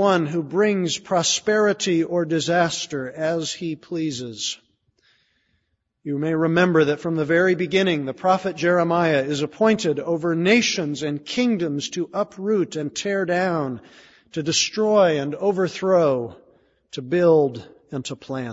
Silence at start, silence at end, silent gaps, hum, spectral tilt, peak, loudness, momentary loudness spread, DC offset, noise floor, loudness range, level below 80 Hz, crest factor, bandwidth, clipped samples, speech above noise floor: 0 s; 0 s; none; none; -4.5 dB/octave; -4 dBFS; -21 LUFS; 11 LU; under 0.1%; -72 dBFS; 5 LU; -62 dBFS; 18 dB; 8 kHz; under 0.1%; 51 dB